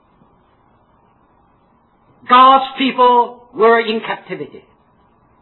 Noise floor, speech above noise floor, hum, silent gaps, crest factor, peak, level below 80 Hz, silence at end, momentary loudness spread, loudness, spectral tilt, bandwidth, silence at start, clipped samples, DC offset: -55 dBFS; 42 dB; none; none; 16 dB; 0 dBFS; -60 dBFS; 0.95 s; 19 LU; -13 LUFS; -7 dB/octave; 4.3 kHz; 2.3 s; under 0.1%; under 0.1%